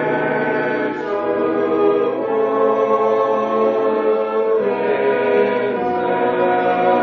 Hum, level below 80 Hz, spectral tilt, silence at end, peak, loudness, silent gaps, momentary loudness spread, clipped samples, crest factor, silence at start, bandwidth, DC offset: none; -60 dBFS; -4 dB/octave; 0 s; -4 dBFS; -17 LUFS; none; 3 LU; under 0.1%; 12 dB; 0 s; 6.2 kHz; under 0.1%